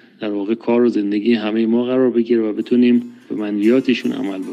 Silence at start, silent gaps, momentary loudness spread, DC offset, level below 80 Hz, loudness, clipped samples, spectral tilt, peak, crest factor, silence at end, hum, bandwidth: 0.2 s; none; 9 LU; under 0.1%; -74 dBFS; -17 LUFS; under 0.1%; -7 dB/octave; -4 dBFS; 12 dB; 0 s; none; 7.4 kHz